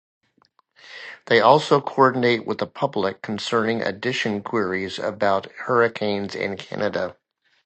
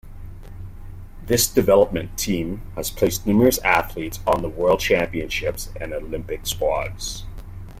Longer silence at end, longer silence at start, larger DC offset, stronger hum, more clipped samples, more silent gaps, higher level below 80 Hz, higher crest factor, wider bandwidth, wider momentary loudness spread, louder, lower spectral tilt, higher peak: first, 0.55 s vs 0 s; first, 0.85 s vs 0.05 s; neither; neither; neither; neither; second, -62 dBFS vs -36 dBFS; about the same, 22 dB vs 20 dB; second, 8.8 kHz vs 16.5 kHz; second, 11 LU vs 23 LU; about the same, -22 LUFS vs -21 LUFS; first, -5.5 dB/octave vs -4 dB/octave; about the same, 0 dBFS vs -2 dBFS